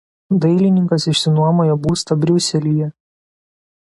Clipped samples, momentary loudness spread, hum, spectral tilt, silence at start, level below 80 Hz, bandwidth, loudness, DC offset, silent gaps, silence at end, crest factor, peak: under 0.1%; 5 LU; none; -6 dB/octave; 0.3 s; -48 dBFS; 11.5 kHz; -16 LUFS; under 0.1%; none; 1.1 s; 14 dB; -4 dBFS